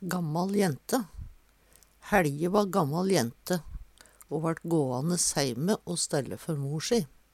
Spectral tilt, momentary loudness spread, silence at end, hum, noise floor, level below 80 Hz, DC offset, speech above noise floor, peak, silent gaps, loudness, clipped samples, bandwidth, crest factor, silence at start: -4.5 dB/octave; 8 LU; 0.25 s; none; -61 dBFS; -52 dBFS; under 0.1%; 33 dB; -10 dBFS; none; -29 LUFS; under 0.1%; 16.5 kHz; 20 dB; 0 s